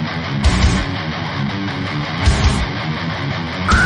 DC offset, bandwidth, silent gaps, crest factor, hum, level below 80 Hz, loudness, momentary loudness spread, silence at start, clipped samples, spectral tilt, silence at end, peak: under 0.1%; 10.5 kHz; none; 14 dB; none; -22 dBFS; -19 LUFS; 7 LU; 0 s; under 0.1%; -5 dB/octave; 0 s; -2 dBFS